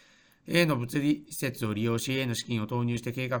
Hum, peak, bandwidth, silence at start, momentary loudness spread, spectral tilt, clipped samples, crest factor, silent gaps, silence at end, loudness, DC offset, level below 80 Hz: none; -8 dBFS; over 20 kHz; 0.45 s; 6 LU; -5.5 dB/octave; under 0.1%; 20 dB; none; 0 s; -29 LUFS; under 0.1%; -62 dBFS